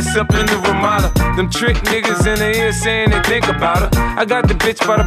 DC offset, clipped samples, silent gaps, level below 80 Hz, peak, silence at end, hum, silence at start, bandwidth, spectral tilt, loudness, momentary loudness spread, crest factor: under 0.1%; under 0.1%; none; -22 dBFS; 0 dBFS; 0 s; none; 0 s; 15.5 kHz; -4.5 dB/octave; -15 LUFS; 2 LU; 14 dB